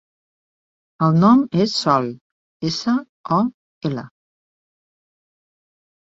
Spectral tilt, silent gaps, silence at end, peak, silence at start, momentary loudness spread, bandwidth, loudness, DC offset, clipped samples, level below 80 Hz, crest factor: -6.5 dB/octave; 2.21-2.60 s, 3.09-3.24 s, 3.54-3.81 s; 1.95 s; -2 dBFS; 1 s; 14 LU; 7.8 kHz; -19 LUFS; under 0.1%; under 0.1%; -60 dBFS; 20 dB